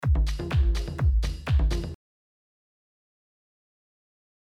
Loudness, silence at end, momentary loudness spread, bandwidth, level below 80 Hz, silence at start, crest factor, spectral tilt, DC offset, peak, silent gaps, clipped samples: -27 LUFS; 2.6 s; 8 LU; 10.5 kHz; -28 dBFS; 0 s; 14 dB; -6.5 dB/octave; under 0.1%; -14 dBFS; none; under 0.1%